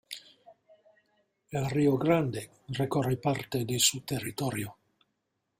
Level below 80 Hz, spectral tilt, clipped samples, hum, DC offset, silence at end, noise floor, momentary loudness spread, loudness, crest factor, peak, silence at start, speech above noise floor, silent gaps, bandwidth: -62 dBFS; -4.5 dB/octave; under 0.1%; none; under 0.1%; 0.9 s; -81 dBFS; 14 LU; -29 LUFS; 22 dB; -10 dBFS; 0.1 s; 51 dB; none; 16 kHz